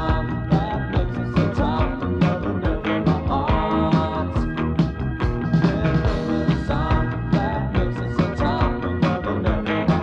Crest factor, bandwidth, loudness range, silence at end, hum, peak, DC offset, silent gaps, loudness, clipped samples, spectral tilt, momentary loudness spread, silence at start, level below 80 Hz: 14 dB; 7.6 kHz; 1 LU; 0 s; none; -6 dBFS; under 0.1%; none; -22 LUFS; under 0.1%; -8.5 dB/octave; 4 LU; 0 s; -28 dBFS